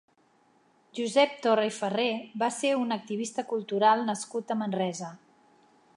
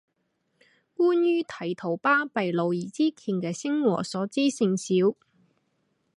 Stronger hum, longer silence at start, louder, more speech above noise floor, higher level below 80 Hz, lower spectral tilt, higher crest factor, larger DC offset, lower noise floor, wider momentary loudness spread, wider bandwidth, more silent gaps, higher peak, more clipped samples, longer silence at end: neither; about the same, 0.95 s vs 1 s; about the same, -28 LUFS vs -26 LUFS; second, 37 dB vs 50 dB; second, -84 dBFS vs -76 dBFS; second, -4 dB/octave vs -5.5 dB/octave; about the same, 20 dB vs 16 dB; neither; second, -65 dBFS vs -75 dBFS; about the same, 9 LU vs 7 LU; about the same, 11.5 kHz vs 11.5 kHz; neither; about the same, -10 dBFS vs -10 dBFS; neither; second, 0.8 s vs 1.05 s